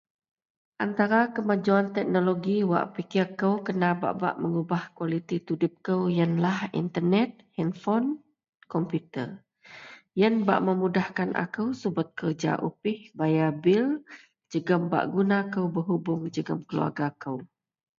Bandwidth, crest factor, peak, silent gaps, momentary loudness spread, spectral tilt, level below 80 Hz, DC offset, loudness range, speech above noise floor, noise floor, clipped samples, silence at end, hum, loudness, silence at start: 7.4 kHz; 20 dB; -6 dBFS; 8.49-8.53 s; 9 LU; -8 dB/octave; -72 dBFS; under 0.1%; 3 LU; 22 dB; -49 dBFS; under 0.1%; 0.55 s; none; -27 LUFS; 0.8 s